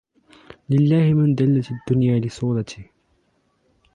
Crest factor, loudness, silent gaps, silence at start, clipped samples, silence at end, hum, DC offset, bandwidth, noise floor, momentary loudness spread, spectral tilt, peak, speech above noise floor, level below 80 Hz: 14 dB; -19 LUFS; none; 0.7 s; under 0.1%; 1.1 s; none; under 0.1%; 9 kHz; -65 dBFS; 9 LU; -9 dB/octave; -8 dBFS; 47 dB; -54 dBFS